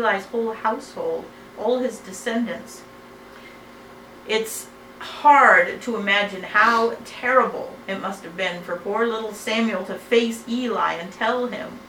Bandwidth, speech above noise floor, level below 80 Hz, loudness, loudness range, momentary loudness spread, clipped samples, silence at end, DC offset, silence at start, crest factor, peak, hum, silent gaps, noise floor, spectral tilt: 19 kHz; 21 dB; -62 dBFS; -21 LUFS; 11 LU; 17 LU; under 0.1%; 0 s; under 0.1%; 0 s; 22 dB; 0 dBFS; none; none; -43 dBFS; -3.5 dB/octave